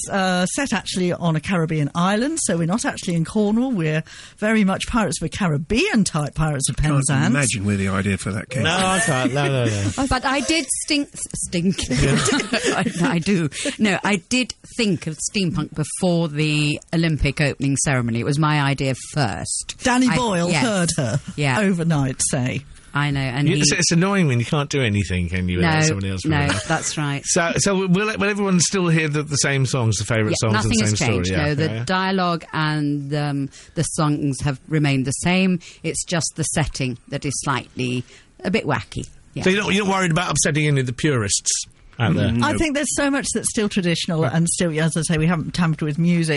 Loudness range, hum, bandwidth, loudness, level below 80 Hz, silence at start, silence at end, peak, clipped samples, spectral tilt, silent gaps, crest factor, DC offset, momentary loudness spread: 3 LU; none; 11.5 kHz; -20 LUFS; -40 dBFS; 0 s; 0 s; -4 dBFS; under 0.1%; -4.5 dB/octave; none; 16 dB; under 0.1%; 6 LU